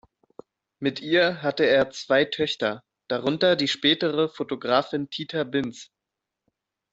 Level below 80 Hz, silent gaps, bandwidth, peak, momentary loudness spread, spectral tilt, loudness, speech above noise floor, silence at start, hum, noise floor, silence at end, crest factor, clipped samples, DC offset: -64 dBFS; none; 8 kHz; -6 dBFS; 9 LU; -4.5 dB/octave; -24 LUFS; 62 dB; 0.8 s; none; -85 dBFS; 1.1 s; 20 dB; under 0.1%; under 0.1%